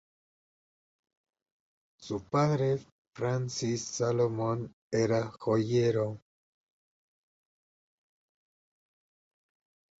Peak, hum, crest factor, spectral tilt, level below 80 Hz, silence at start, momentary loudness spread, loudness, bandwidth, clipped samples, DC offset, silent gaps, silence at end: -16 dBFS; none; 18 dB; -6 dB/octave; -66 dBFS; 2 s; 9 LU; -31 LUFS; 8 kHz; under 0.1%; under 0.1%; 2.92-3.11 s, 4.73-4.90 s; 3.8 s